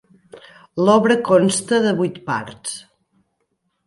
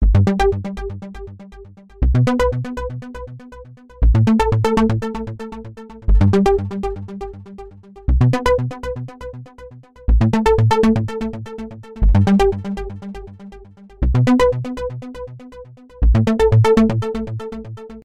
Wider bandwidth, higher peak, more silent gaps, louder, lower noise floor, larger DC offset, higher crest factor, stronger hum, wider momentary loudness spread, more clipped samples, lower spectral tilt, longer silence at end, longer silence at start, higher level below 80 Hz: about the same, 11.5 kHz vs 10.5 kHz; about the same, -2 dBFS vs -2 dBFS; neither; about the same, -17 LUFS vs -18 LUFS; first, -71 dBFS vs -41 dBFS; second, under 0.1% vs 0.5%; about the same, 18 dB vs 16 dB; neither; second, 15 LU vs 21 LU; neither; second, -5 dB/octave vs -8 dB/octave; first, 1.05 s vs 0.05 s; first, 0.35 s vs 0 s; second, -62 dBFS vs -24 dBFS